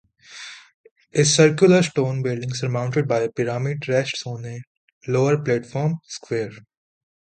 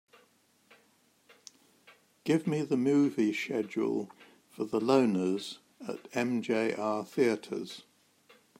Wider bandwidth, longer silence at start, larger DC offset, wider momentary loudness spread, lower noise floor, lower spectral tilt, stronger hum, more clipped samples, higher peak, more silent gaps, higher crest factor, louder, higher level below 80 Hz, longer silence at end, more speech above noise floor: second, 9.4 kHz vs 15.5 kHz; second, 0.3 s vs 2.25 s; neither; first, 20 LU vs 16 LU; second, -41 dBFS vs -68 dBFS; about the same, -5 dB/octave vs -6 dB/octave; neither; neither; first, -2 dBFS vs -12 dBFS; first, 0.74-0.84 s, 0.91-0.96 s, 4.67-5.01 s vs none; about the same, 20 dB vs 20 dB; first, -21 LUFS vs -31 LUFS; first, -62 dBFS vs -78 dBFS; second, 0.65 s vs 0.8 s; second, 20 dB vs 38 dB